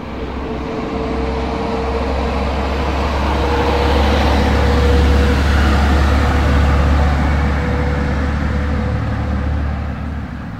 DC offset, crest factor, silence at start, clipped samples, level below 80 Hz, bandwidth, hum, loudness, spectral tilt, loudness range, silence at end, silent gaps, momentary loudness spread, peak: under 0.1%; 14 dB; 0 s; under 0.1%; -18 dBFS; 9.2 kHz; none; -17 LUFS; -7 dB/octave; 5 LU; 0 s; none; 9 LU; -2 dBFS